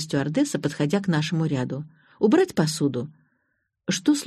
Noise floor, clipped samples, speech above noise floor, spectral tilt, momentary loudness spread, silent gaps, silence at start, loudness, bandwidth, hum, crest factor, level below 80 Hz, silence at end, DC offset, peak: -74 dBFS; under 0.1%; 51 dB; -5.5 dB/octave; 14 LU; none; 0 s; -24 LUFS; 13.5 kHz; none; 16 dB; -62 dBFS; 0 s; under 0.1%; -8 dBFS